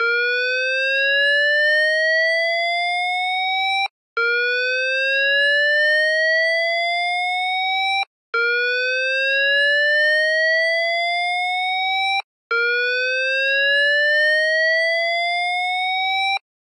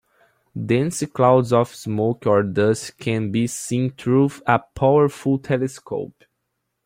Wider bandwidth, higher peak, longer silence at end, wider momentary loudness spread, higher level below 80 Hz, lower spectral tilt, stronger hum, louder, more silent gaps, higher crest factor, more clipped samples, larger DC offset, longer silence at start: second, 11.5 kHz vs 16 kHz; second, -10 dBFS vs -2 dBFS; second, 0.3 s vs 0.8 s; second, 5 LU vs 10 LU; second, under -90 dBFS vs -54 dBFS; second, 5 dB/octave vs -6.5 dB/octave; neither; first, -17 LUFS vs -20 LUFS; first, 3.90-4.16 s, 8.07-8.33 s, 12.24-12.50 s vs none; second, 10 dB vs 18 dB; neither; neither; second, 0 s vs 0.55 s